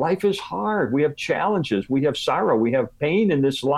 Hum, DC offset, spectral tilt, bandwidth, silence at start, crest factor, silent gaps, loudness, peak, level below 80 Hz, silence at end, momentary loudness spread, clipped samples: none; under 0.1%; -6 dB/octave; 14 kHz; 0 s; 14 dB; none; -22 LUFS; -8 dBFS; -58 dBFS; 0 s; 4 LU; under 0.1%